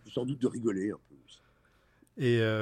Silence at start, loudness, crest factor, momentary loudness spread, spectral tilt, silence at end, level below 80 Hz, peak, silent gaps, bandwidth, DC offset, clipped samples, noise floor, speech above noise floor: 0.05 s; -31 LUFS; 16 dB; 15 LU; -7 dB/octave; 0 s; -70 dBFS; -18 dBFS; none; 11 kHz; under 0.1%; under 0.1%; -67 dBFS; 36 dB